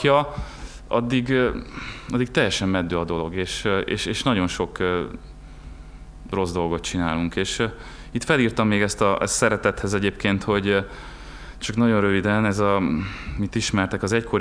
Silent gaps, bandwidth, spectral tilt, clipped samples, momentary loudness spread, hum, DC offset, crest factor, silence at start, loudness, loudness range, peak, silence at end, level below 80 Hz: none; 11 kHz; -5 dB/octave; under 0.1%; 16 LU; none; under 0.1%; 18 dB; 0 s; -23 LUFS; 4 LU; -4 dBFS; 0 s; -40 dBFS